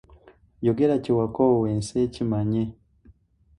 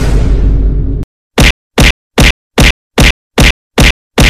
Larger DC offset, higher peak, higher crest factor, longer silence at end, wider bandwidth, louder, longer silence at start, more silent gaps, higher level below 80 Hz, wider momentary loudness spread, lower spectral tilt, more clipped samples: neither; second, -8 dBFS vs 0 dBFS; first, 18 dB vs 8 dB; first, 0.45 s vs 0 s; second, 11 kHz vs 15.5 kHz; second, -24 LUFS vs -10 LUFS; first, 0.6 s vs 0 s; second, none vs 1.04-1.30 s, 1.51-1.70 s, 1.91-2.10 s, 2.31-2.50 s, 2.71-2.90 s, 3.11-3.30 s, 3.51-3.70 s, 3.91-4.10 s; second, -52 dBFS vs -12 dBFS; about the same, 6 LU vs 5 LU; first, -8 dB/octave vs -4 dB/octave; neither